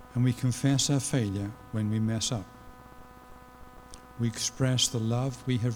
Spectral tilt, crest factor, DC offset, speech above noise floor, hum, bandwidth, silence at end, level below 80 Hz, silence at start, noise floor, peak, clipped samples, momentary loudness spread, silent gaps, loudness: -4.5 dB/octave; 18 dB; under 0.1%; 22 dB; none; 17 kHz; 0 s; -54 dBFS; 0 s; -50 dBFS; -12 dBFS; under 0.1%; 11 LU; none; -29 LUFS